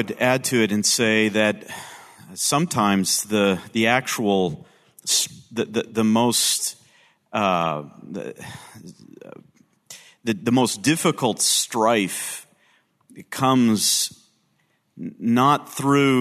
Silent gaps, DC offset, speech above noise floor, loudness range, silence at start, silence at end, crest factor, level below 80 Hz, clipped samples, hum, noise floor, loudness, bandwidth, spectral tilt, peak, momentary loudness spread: none; under 0.1%; 46 dB; 6 LU; 0 s; 0 s; 20 dB; -66 dBFS; under 0.1%; none; -67 dBFS; -20 LUFS; 14 kHz; -3.5 dB/octave; -4 dBFS; 17 LU